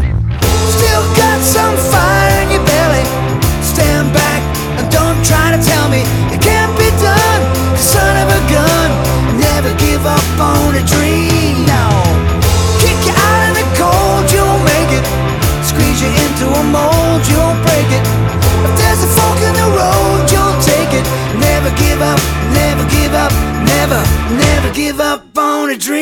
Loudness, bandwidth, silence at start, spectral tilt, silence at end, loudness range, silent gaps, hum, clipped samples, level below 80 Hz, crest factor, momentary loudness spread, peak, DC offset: -11 LUFS; over 20 kHz; 0 s; -4.5 dB/octave; 0 s; 1 LU; none; none; under 0.1%; -20 dBFS; 10 dB; 4 LU; 0 dBFS; under 0.1%